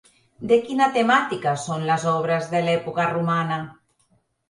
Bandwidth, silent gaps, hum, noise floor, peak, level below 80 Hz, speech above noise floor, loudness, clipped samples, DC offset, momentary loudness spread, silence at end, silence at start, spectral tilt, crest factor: 11.5 kHz; none; none; -65 dBFS; -6 dBFS; -64 dBFS; 44 dB; -22 LUFS; under 0.1%; under 0.1%; 8 LU; 0.8 s; 0.4 s; -5.5 dB/octave; 18 dB